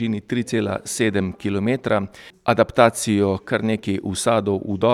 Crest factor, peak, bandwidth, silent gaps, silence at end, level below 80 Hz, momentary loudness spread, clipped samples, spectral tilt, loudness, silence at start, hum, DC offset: 20 dB; 0 dBFS; 15 kHz; none; 0 s; -52 dBFS; 8 LU; under 0.1%; -5 dB/octave; -21 LUFS; 0 s; none; under 0.1%